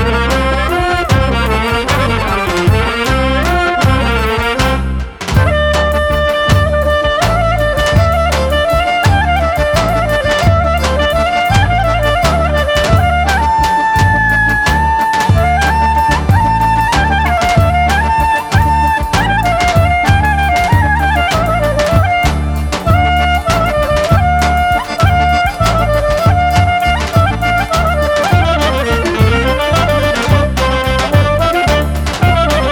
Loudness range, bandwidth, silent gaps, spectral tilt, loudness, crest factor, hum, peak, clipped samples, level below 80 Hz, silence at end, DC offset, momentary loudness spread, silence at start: 2 LU; over 20 kHz; none; -5.5 dB/octave; -12 LUFS; 10 dB; none; 0 dBFS; under 0.1%; -18 dBFS; 0 s; under 0.1%; 2 LU; 0 s